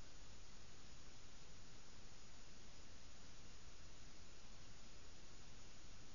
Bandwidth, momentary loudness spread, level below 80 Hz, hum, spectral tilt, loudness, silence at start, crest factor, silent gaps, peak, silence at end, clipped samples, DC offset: 7.2 kHz; 0 LU; -64 dBFS; none; -3 dB/octave; -62 LUFS; 0 s; 12 dB; none; -42 dBFS; 0 s; under 0.1%; 0.3%